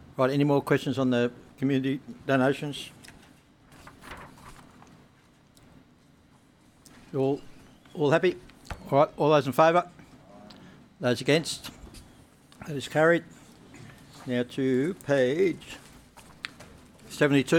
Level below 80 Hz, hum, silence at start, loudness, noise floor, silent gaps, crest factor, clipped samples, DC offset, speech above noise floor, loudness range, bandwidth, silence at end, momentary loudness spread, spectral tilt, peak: -58 dBFS; none; 0.2 s; -26 LUFS; -59 dBFS; none; 20 dB; under 0.1%; under 0.1%; 34 dB; 9 LU; 17.5 kHz; 0 s; 22 LU; -6 dB/octave; -8 dBFS